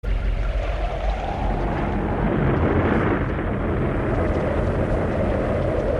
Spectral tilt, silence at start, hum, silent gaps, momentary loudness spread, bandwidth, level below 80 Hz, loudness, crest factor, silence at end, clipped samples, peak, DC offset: -8.5 dB/octave; 0.05 s; none; none; 6 LU; 7 kHz; -26 dBFS; -23 LUFS; 14 dB; 0 s; under 0.1%; -8 dBFS; under 0.1%